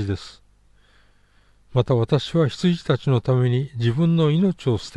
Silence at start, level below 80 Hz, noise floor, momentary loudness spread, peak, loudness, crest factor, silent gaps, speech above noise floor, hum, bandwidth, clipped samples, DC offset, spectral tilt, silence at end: 0 s; -50 dBFS; -56 dBFS; 7 LU; -6 dBFS; -21 LUFS; 14 dB; none; 36 dB; 50 Hz at -45 dBFS; 9.6 kHz; under 0.1%; under 0.1%; -8 dB/octave; 0 s